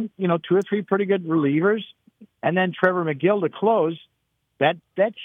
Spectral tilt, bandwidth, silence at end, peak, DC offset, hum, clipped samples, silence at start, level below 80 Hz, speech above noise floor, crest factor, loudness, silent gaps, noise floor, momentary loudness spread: -8 dB/octave; 6.6 kHz; 0 s; -4 dBFS; under 0.1%; none; under 0.1%; 0 s; -76 dBFS; 50 dB; 20 dB; -22 LUFS; none; -72 dBFS; 6 LU